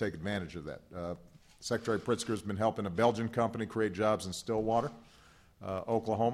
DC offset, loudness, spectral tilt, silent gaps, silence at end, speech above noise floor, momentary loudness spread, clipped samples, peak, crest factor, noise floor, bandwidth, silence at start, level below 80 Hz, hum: under 0.1%; -34 LUFS; -5.5 dB/octave; none; 0 s; 28 dB; 12 LU; under 0.1%; -14 dBFS; 20 dB; -61 dBFS; 15 kHz; 0 s; -64 dBFS; none